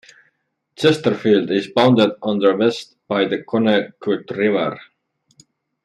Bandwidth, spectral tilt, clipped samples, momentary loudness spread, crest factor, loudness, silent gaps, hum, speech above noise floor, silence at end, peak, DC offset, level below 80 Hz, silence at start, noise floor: 12 kHz; -6 dB/octave; under 0.1%; 9 LU; 16 dB; -18 LUFS; none; none; 50 dB; 1.05 s; -2 dBFS; under 0.1%; -64 dBFS; 0.8 s; -67 dBFS